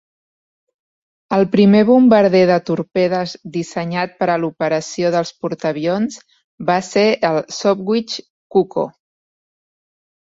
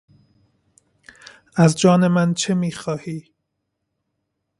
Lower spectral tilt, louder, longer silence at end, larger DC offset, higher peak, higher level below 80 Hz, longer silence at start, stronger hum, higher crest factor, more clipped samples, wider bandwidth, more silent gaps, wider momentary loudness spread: about the same, -6 dB/octave vs -6 dB/octave; about the same, -16 LUFS vs -18 LUFS; about the same, 1.35 s vs 1.4 s; neither; about the same, -2 dBFS vs -2 dBFS; about the same, -60 dBFS vs -60 dBFS; second, 1.3 s vs 1.55 s; neither; about the same, 16 dB vs 20 dB; neither; second, 7.8 kHz vs 11.5 kHz; first, 6.44-6.58 s, 8.30-8.50 s vs none; about the same, 13 LU vs 14 LU